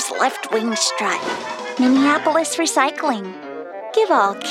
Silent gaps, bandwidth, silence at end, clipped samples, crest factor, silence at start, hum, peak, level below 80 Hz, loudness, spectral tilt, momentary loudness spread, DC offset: none; 15.5 kHz; 0 s; under 0.1%; 16 dB; 0 s; none; -2 dBFS; -76 dBFS; -18 LUFS; -2 dB/octave; 11 LU; under 0.1%